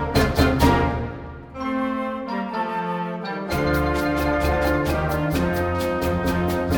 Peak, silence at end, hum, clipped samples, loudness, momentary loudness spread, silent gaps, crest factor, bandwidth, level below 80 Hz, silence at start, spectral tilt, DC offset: -4 dBFS; 0 s; none; under 0.1%; -23 LUFS; 9 LU; none; 18 dB; over 20 kHz; -32 dBFS; 0 s; -6.5 dB/octave; under 0.1%